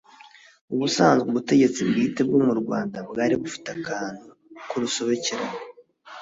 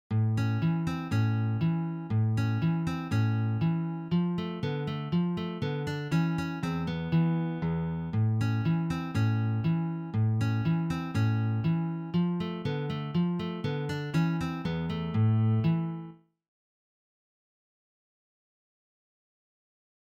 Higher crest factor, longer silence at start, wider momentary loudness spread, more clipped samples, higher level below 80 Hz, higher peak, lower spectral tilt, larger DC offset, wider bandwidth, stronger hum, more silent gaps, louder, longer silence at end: first, 20 dB vs 14 dB; first, 0.7 s vs 0.1 s; first, 15 LU vs 5 LU; neither; second, -64 dBFS vs -56 dBFS; first, -6 dBFS vs -16 dBFS; second, -4.5 dB/octave vs -8 dB/octave; neither; about the same, 7.8 kHz vs 7.8 kHz; neither; neither; first, -23 LUFS vs -30 LUFS; second, 0 s vs 3.95 s